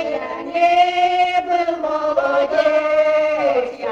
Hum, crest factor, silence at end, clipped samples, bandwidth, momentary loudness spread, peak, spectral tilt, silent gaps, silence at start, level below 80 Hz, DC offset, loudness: none; 14 dB; 0 s; under 0.1%; 8 kHz; 6 LU; -4 dBFS; -3.5 dB/octave; none; 0 s; -56 dBFS; under 0.1%; -17 LUFS